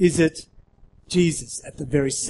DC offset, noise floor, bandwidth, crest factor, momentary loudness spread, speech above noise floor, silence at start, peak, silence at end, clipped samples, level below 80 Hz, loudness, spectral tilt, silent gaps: under 0.1%; -51 dBFS; 11.5 kHz; 18 dB; 13 LU; 30 dB; 0 s; -4 dBFS; 0 s; under 0.1%; -46 dBFS; -23 LUFS; -5 dB/octave; none